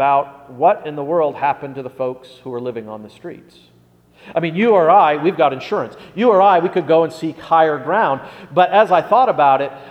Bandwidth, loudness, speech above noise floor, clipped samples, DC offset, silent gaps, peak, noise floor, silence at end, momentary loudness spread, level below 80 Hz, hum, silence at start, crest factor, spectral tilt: 10.5 kHz; -16 LUFS; 35 dB; under 0.1%; under 0.1%; none; 0 dBFS; -51 dBFS; 0 s; 17 LU; -62 dBFS; none; 0 s; 16 dB; -7 dB/octave